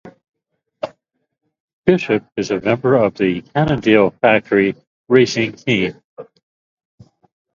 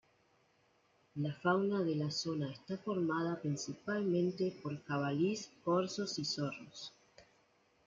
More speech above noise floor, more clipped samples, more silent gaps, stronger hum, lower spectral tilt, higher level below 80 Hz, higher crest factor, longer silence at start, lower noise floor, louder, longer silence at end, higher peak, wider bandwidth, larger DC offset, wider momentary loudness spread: first, 57 dB vs 36 dB; neither; first, 1.60-1.83 s, 4.87-5.05 s, 6.04-6.17 s vs none; neither; about the same, -6 dB/octave vs -5.5 dB/octave; first, -50 dBFS vs -78 dBFS; about the same, 18 dB vs 18 dB; second, 0.05 s vs 1.15 s; about the same, -72 dBFS vs -73 dBFS; first, -16 LUFS vs -37 LUFS; first, 1.3 s vs 0.65 s; first, 0 dBFS vs -20 dBFS; about the same, 7.4 kHz vs 7.6 kHz; neither; first, 12 LU vs 9 LU